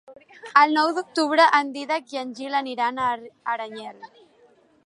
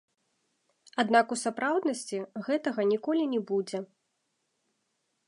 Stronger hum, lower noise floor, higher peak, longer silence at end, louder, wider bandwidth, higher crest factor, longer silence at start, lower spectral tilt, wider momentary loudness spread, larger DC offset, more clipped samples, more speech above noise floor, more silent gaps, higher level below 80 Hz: neither; second, -58 dBFS vs -78 dBFS; first, -2 dBFS vs -8 dBFS; second, 0.8 s vs 1.45 s; first, -22 LUFS vs -29 LUFS; about the same, 11.5 kHz vs 11.5 kHz; about the same, 22 dB vs 22 dB; second, 0.1 s vs 0.95 s; second, -2.5 dB/octave vs -4 dB/octave; first, 16 LU vs 12 LU; neither; neither; second, 35 dB vs 50 dB; neither; first, -76 dBFS vs -84 dBFS